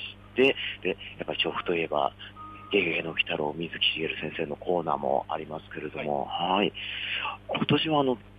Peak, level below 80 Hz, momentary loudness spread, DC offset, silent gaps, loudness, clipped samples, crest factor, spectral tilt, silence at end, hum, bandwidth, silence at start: -10 dBFS; -58 dBFS; 11 LU; under 0.1%; none; -28 LUFS; under 0.1%; 18 dB; -7 dB/octave; 0 s; 50 Hz at -50 dBFS; 8.2 kHz; 0 s